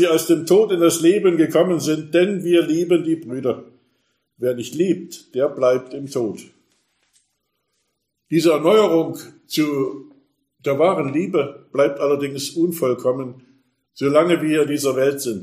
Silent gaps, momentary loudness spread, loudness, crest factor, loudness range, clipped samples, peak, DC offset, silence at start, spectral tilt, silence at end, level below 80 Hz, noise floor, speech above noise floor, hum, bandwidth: none; 11 LU; -19 LUFS; 18 dB; 6 LU; under 0.1%; -2 dBFS; under 0.1%; 0 s; -5.5 dB/octave; 0 s; -68 dBFS; -73 dBFS; 55 dB; none; 15.5 kHz